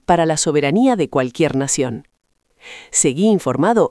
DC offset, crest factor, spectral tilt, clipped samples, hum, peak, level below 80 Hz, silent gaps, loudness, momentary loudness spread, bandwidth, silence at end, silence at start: under 0.1%; 16 dB; -4.5 dB/octave; under 0.1%; none; -2 dBFS; -50 dBFS; none; -16 LUFS; 9 LU; 12 kHz; 0 s; 0.1 s